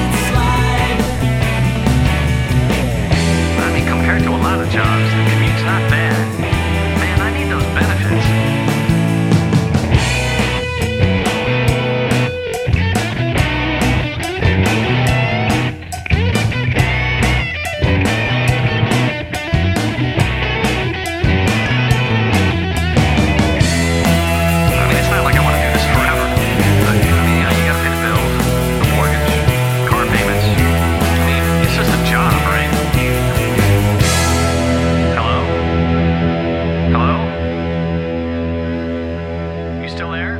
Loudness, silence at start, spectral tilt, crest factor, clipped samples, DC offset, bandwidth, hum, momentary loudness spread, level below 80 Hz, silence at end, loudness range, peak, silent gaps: -15 LUFS; 0 s; -5.5 dB/octave; 14 dB; under 0.1%; under 0.1%; 16.5 kHz; none; 5 LU; -24 dBFS; 0 s; 3 LU; 0 dBFS; none